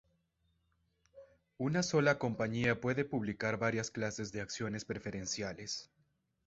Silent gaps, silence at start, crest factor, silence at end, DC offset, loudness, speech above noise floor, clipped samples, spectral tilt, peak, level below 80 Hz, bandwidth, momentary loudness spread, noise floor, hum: none; 1.15 s; 22 dB; 0.6 s; under 0.1%; -36 LUFS; 42 dB; under 0.1%; -4.5 dB/octave; -16 dBFS; -66 dBFS; 8 kHz; 10 LU; -78 dBFS; none